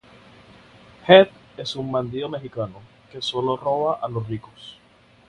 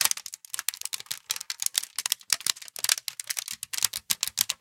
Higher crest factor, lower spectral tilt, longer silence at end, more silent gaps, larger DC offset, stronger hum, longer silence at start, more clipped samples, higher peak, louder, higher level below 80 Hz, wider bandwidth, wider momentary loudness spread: second, 22 dB vs 30 dB; first, -6 dB/octave vs 3 dB/octave; first, 0.55 s vs 0.05 s; neither; neither; neither; first, 1.05 s vs 0 s; neither; about the same, 0 dBFS vs -2 dBFS; first, -21 LUFS vs -28 LUFS; first, -58 dBFS vs -70 dBFS; second, 9.8 kHz vs 17 kHz; first, 23 LU vs 7 LU